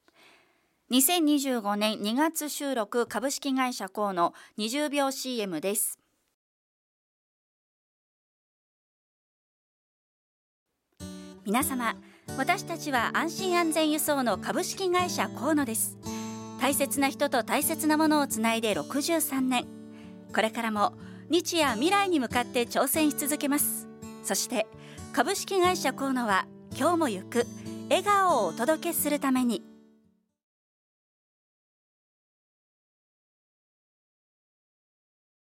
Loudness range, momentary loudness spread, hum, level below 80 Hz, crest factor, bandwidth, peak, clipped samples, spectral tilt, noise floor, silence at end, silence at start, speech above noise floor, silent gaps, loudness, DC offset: 6 LU; 11 LU; none; -68 dBFS; 20 dB; 16.5 kHz; -10 dBFS; under 0.1%; -3 dB/octave; -68 dBFS; 5.75 s; 0.9 s; 41 dB; 6.34-10.66 s; -27 LUFS; under 0.1%